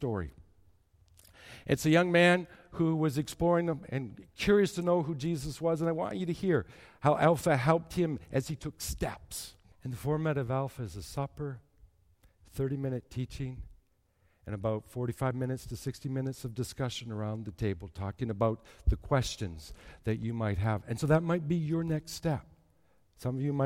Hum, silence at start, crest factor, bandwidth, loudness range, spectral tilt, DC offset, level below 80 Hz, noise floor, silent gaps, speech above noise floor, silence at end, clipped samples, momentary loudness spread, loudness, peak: none; 0 s; 20 dB; 16.5 kHz; 8 LU; -6.5 dB/octave; under 0.1%; -48 dBFS; -70 dBFS; none; 39 dB; 0 s; under 0.1%; 15 LU; -32 LUFS; -12 dBFS